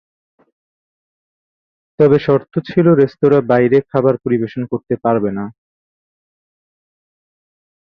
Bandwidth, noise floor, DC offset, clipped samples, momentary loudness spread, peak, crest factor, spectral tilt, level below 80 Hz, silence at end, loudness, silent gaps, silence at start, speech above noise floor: 5.6 kHz; under -90 dBFS; under 0.1%; under 0.1%; 9 LU; -2 dBFS; 16 dB; -10 dB/octave; -54 dBFS; 2.45 s; -15 LUFS; none; 2 s; over 76 dB